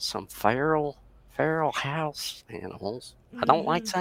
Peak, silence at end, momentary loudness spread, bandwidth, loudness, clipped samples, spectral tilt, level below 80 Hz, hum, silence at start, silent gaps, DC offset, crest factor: -4 dBFS; 0 s; 15 LU; 16.5 kHz; -28 LUFS; under 0.1%; -4.5 dB/octave; -58 dBFS; none; 0 s; none; under 0.1%; 24 dB